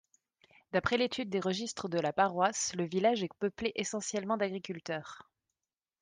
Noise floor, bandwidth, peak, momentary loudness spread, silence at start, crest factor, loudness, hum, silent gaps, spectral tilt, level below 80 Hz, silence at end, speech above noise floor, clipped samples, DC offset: under -90 dBFS; 10.5 kHz; -14 dBFS; 9 LU; 0.75 s; 20 dB; -33 LUFS; none; none; -4 dB/octave; -68 dBFS; 0.8 s; over 57 dB; under 0.1%; under 0.1%